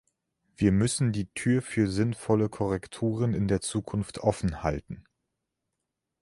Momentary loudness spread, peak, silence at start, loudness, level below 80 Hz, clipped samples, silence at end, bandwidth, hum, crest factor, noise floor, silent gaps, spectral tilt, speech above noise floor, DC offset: 7 LU; -8 dBFS; 0.6 s; -28 LUFS; -48 dBFS; under 0.1%; 1.2 s; 11.5 kHz; none; 20 dB; -84 dBFS; none; -6 dB/octave; 57 dB; under 0.1%